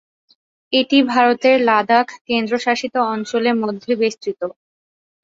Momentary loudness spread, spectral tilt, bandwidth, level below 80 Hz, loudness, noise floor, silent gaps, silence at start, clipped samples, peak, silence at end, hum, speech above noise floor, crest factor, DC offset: 8 LU; -4 dB/octave; 7.8 kHz; -66 dBFS; -17 LUFS; under -90 dBFS; 2.21-2.25 s; 0.7 s; under 0.1%; -2 dBFS; 0.75 s; none; over 73 dB; 16 dB; under 0.1%